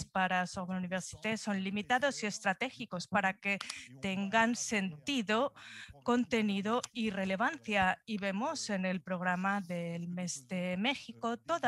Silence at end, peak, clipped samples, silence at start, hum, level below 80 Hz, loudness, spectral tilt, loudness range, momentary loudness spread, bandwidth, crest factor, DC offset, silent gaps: 0 s; -14 dBFS; under 0.1%; 0 s; none; -70 dBFS; -34 LUFS; -4 dB/octave; 2 LU; 8 LU; 12.5 kHz; 20 dB; under 0.1%; none